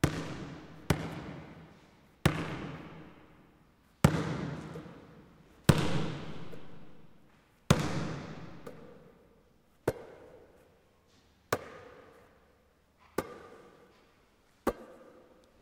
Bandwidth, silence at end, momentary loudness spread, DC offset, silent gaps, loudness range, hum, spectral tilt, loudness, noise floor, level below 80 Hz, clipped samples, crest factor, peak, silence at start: 16 kHz; 0.55 s; 26 LU; under 0.1%; none; 11 LU; none; -5.5 dB/octave; -34 LUFS; -67 dBFS; -54 dBFS; under 0.1%; 30 dB; -6 dBFS; 0.05 s